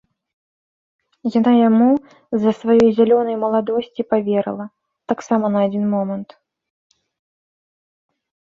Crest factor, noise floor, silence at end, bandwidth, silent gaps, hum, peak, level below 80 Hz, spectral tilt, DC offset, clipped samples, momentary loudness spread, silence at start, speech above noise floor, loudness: 16 dB; under -90 dBFS; 2.2 s; 7.2 kHz; none; none; -2 dBFS; -62 dBFS; -8 dB/octave; under 0.1%; under 0.1%; 12 LU; 1.25 s; over 73 dB; -17 LUFS